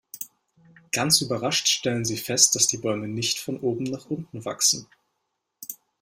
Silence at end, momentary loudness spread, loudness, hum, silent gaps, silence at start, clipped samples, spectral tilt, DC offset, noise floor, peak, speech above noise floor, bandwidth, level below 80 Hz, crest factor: 0.25 s; 19 LU; -23 LUFS; none; none; 0.15 s; under 0.1%; -2 dB/octave; under 0.1%; -79 dBFS; -2 dBFS; 54 dB; 16 kHz; -64 dBFS; 24 dB